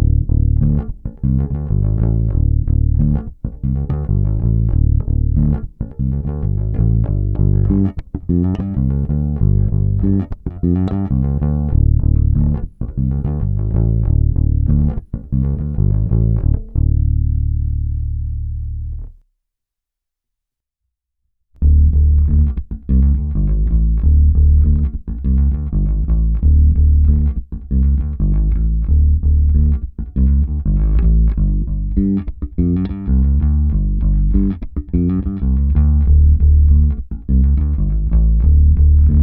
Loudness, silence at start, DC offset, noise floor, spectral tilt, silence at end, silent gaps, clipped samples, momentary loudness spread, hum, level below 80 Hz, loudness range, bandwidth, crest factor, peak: -17 LUFS; 0 s; under 0.1%; -82 dBFS; -13.5 dB/octave; 0 s; none; under 0.1%; 9 LU; none; -16 dBFS; 4 LU; 1.8 kHz; 12 dB; -2 dBFS